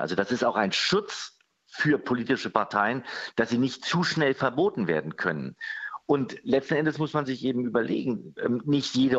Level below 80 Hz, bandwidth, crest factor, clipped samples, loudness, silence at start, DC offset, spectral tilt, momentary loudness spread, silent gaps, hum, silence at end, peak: -68 dBFS; 8.2 kHz; 22 dB; under 0.1%; -27 LUFS; 0 s; under 0.1%; -5 dB/octave; 9 LU; none; none; 0 s; -4 dBFS